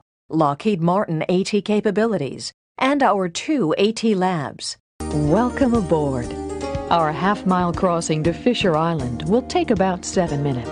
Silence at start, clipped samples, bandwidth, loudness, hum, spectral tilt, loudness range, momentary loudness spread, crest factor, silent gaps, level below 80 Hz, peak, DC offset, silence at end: 0.3 s; under 0.1%; 10.5 kHz; -20 LUFS; none; -6 dB/octave; 1 LU; 9 LU; 18 dB; 2.54-2.75 s, 4.80-4.99 s; -42 dBFS; -2 dBFS; under 0.1%; 0 s